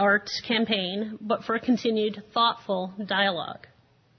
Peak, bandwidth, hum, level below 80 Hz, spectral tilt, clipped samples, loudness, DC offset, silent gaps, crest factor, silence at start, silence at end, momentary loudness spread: -8 dBFS; 6.6 kHz; none; -68 dBFS; -5 dB/octave; under 0.1%; -26 LUFS; under 0.1%; none; 18 dB; 0 s; 0.6 s; 8 LU